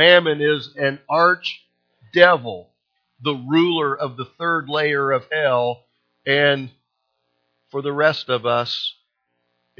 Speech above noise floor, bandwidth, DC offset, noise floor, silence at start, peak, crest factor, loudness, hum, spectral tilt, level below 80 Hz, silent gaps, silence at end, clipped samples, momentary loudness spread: 55 dB; 5.4 kHz; under 0.1%; -73 dBFS; 0 s; 0 dBFS; 20 dB; -19 LUFS; 60 Hz at -55 dBFS; -6 dB/octave; -66 dBFS; none; 0.9 s; under 0.1%; 14 LU